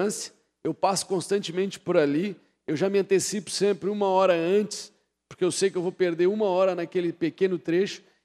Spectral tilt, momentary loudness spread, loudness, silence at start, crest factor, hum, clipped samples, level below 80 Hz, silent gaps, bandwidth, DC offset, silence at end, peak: -4.5 dB/octave; 10 LU; -25 LUFS; 0 s; 18 dB; none; under 0.1%; -74 dBFS; none; 13.5 kHz; under 0.1%; 0.25 s; -8 dBFS